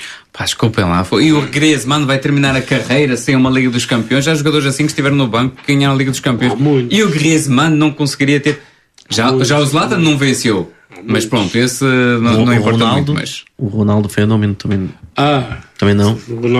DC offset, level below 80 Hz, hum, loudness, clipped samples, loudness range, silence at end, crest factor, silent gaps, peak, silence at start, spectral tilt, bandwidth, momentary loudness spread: under 0.1%; -44 dBFS; none; -13 LUFS; under 0.1%; 2 LU; 0 s; 12 dB; none; 0 dBFS; 0 s; -5 dB/octave; 14 kHz; 7 LU